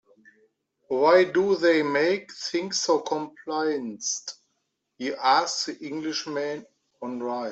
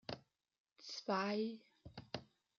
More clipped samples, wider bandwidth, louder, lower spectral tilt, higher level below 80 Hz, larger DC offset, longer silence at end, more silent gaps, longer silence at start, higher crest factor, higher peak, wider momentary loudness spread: neither; about the same, 8.2 kHz vs 7.6 kHz; first, -25 LUFS vs -44 LUFS; about the same, -3 dB/octave vs -3.5 dB/octave; about the same, -74 dBFS vs -76 dBFS; neither; second, 0 s vs 0.35 s; second, none vs 0.60-0.65 s; first, 0.9 s vs 0.1 s; about the same, 20 dB vs 22 dB; first, -6 dBFS vs -24 dBFS; second, 13 LU vs 19 LU